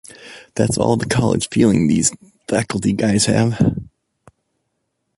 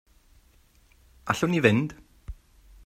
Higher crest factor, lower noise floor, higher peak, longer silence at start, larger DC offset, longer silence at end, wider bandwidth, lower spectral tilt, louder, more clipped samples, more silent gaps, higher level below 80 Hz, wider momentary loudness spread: second, 16 dB vs 24 dB; first, -72 dBFS vs -60 dBFS; about the same, -2 dBFS vs -4 dBFS; second, 0.2 s vs 1.25 s; neither; first, 1.35 s vs 0.5 s; second, 11.5 kHz vs 15.5 kHz; about the same, -5 dB/octave vs -6 dB/octave; first, -17 LUFS vs -24 LUFS; neither; neither; first, -44 dBFS vs -50 dBFS; second, 15 LU vs 26 LU